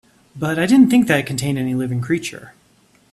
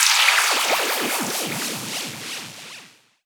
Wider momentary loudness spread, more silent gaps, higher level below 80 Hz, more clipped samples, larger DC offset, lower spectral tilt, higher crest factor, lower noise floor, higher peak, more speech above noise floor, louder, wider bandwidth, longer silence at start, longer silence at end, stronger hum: second, 11 LU vs 21 LU; neither; first, -54 dBFS vs -86 dBFS; neither; neither; first, -5.5 dB/octave vs 0 dB/octave; about the same, 16 dB vs 20 dB; first, -56 dBFS vs -47 dBFS; about the same, -2 dBFS vs -4 dBFS; first, 39 dB vs 23 dB; first, -17 LUFS vs -20 LUFS; second, 13.5 kHz vs over 20 kHz; first, 0.35 s vs 0 s; first, 0.6 s vs 0.4 s; neither